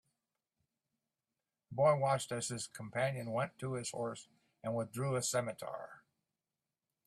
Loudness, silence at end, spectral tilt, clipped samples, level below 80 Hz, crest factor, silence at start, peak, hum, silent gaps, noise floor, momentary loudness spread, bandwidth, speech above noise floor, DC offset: -37 LUFS; 1.1 s; -4.5 dB/octave; under 0.1%; -78 dBFS; 22 dB; 1.7 s; -18 dBFS; none; none; under -90 dBFS; 15 LU; 14.5 kHz; over 53 dB; under 0.1%